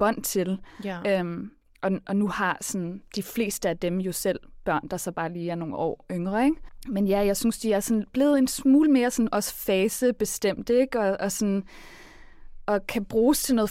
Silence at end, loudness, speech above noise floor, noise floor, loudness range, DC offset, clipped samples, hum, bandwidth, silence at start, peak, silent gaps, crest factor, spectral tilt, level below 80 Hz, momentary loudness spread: 0 s; -26 LUFS; 19 dB; -44 dBFS; 6 LU; under 0.1%; under 0.1%; none; 16.5 kHz; 0 s; -10 dBFS; none; 14 dB; -5 dB/octave; -50 dBFS; 10 LU